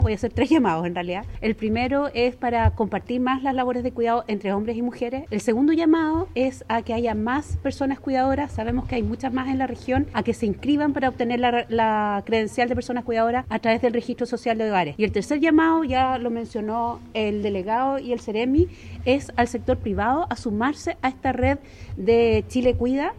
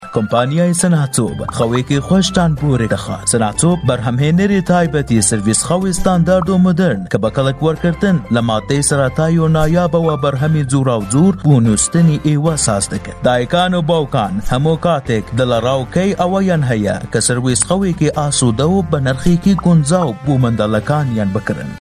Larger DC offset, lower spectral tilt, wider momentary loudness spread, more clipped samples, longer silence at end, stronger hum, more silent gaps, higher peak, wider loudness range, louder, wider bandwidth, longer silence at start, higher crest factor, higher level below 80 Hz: neither; about the same, -6.5 dB/octave vs -5.5 dB/octave; about the same, 7 LU vs 5 LU; neither; about the same, 0 s vs 0.05 s; neither; neither; second, -6 dBFS vs 0 dBFS; about the same, 2 LU vs 2 LU; second, -23 LUFS vs -14 LUFS; second, 12 kHz vs 13.5 kHz; about the same, 0 s vs 0 s; about the same, 16 dB vs 14 dB; second, -40 dBFS vs -34 dBFS